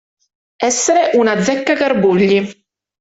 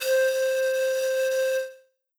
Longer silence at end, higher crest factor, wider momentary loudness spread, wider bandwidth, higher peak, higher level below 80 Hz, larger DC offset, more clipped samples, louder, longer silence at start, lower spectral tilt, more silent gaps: about the same, 0.5 s vs 0.4 s; about the same, 14 dB vs 10 dB; about the same, 5 LU vs 6 LU; second, 8.2 kHz vs over 20 kHz; first, -2 dBFS vs -14 dBFS; first, -54 dBFS vs under -90 dBFS; neither; neither; first, -14 LUFS vs -25 LUFS; first, 0.6 s vs 0 s; first, -4 dB/octave vs 3 dB/octave; neither